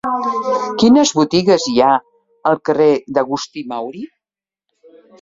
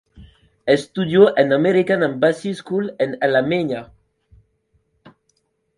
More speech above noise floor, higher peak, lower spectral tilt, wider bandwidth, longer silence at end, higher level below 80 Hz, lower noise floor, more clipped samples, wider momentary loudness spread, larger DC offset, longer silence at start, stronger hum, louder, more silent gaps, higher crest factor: first, over 76 dB vs 50 dB; about the same, -2 dBFS vs 0 dBFS; second, -4.5 dB/octave vs -6.5 dB/octave; second, 7.8 kHz vs 11 kHz; second, 1.15 s vs 1.95 s; about the same, -56 dBFS vs -56 dBFS; first, under -90 dBFS vs -67 dBFS; neither; first, 14 LU vs 11 LU; neither; about the same, 0.05 s vs 0.15 s; neither; first, -15 LUFS vs -18 LUFS; neither; second, 14 dB vs 20 dB